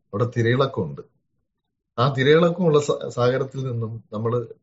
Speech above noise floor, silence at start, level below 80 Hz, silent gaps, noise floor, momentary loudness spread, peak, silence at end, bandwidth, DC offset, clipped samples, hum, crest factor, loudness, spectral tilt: 55 dB; 0.15 s; -60 dBFS; none; -76 dBFS; 13 LU; -4 dBFS; 0.1 s; 8 kHz; under 0.1%; under 0.1%; none; 18 dB; -22 LUFS; -5.5 dB/octave